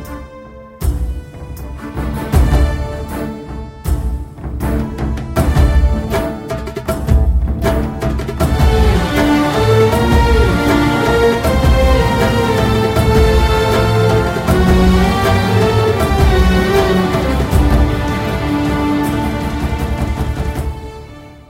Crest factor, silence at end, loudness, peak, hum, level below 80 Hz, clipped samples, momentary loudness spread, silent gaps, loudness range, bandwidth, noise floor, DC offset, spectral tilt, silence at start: 14 dB; 0.1 s; -14 LUFS; 0 dBFS; none; -18 dBFS; under 0.1%; 13 LU; none; 7 LU; 16.5 kHz; -34 dBFS; under 0.1%; -6.5 dB/octave; 0 s